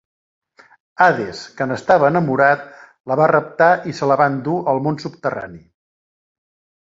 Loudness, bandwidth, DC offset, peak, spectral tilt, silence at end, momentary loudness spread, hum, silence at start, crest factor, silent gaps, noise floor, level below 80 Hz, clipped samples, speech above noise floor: -17 LUFS; 7.8 kHz; under 0.1%; -2 dBFS; -7 dB/octave; 1.25 s; 10 LU; none; 1 s; 18 dB; 3.00-3.04 s; under -90 dBFS; -60 dBFS; under 0.1%; over 73 dB